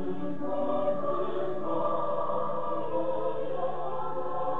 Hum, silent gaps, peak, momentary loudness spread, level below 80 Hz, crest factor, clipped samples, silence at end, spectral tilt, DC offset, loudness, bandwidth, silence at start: none; none; -16 dBFS; 5 LU; -72 dBFS; 14 dB; under 0.1%; 0 s; -9 dB/octave; 3%; -32 LUFS; 7.4 kHz; 0 s